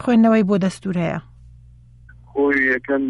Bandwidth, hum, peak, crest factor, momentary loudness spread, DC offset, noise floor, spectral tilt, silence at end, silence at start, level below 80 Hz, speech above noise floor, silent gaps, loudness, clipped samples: 11.5 kHz; none; -6 dBFS; 14 dB; 12 LU; under 0.1%; -46 dBFS; -7 dB/octave; 0 s; 0 s; -48 dBFS; 28 dB; none; -18 LUFS; under 0.1%